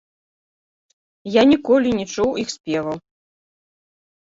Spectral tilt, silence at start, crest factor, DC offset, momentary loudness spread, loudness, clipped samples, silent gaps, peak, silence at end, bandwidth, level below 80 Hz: -5 dB/octave; 1.25 s; 18 dB; under 0.1%; 14 LU; -19 LUFS; under 0.1%; 2.60-2.64 s; -2 dBFS; 1.35 s; 7.8 kHz; -54 dBFS